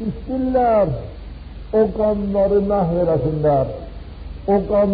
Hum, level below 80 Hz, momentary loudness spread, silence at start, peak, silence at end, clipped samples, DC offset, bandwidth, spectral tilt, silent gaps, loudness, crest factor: none; -34 dBFS; 19 LU; 0 s; -6 dBFS; 0 s; under 0.1%; under 0.1%; 5 kHz; -8.5 dB/octave; none; -19 LUFS; 12 dB